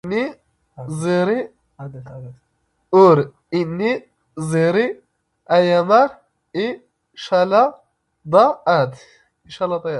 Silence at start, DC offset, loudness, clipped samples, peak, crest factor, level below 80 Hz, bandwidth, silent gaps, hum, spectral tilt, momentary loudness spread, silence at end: 0.05 s; under 0.1%; -18 LUFS; under 0.1%; 0 dBFS; 18 dB; -62 dBFS; 11.5 kHz; none; none; -6.5 dB/octave; 22 LU; 0 s